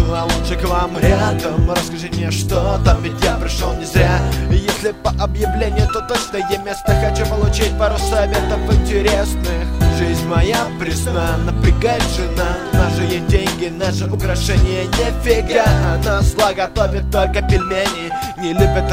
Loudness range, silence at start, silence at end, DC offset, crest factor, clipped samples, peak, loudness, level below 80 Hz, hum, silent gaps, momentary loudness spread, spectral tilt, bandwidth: 1 LU; 0 s; 0 s; under 0.1%; 16 dB; under 0.1%; 0 dBFS; -17 LUFS; -20 dBFS; none; none; 5 LU; -5.5 dB/octave; 16 kHz